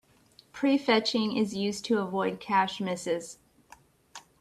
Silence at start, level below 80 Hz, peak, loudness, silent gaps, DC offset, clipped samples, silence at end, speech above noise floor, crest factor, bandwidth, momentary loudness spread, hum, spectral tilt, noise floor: 0.55 s; -70 dBFS; -10 dBFS; -28 LUFS; none; under 0.1%; under 0.1%; 0.2 s; 32 dB; 20 dB; 13.5 kHz; 23 LU; none; -4.5 dB/octave; -60 dBFS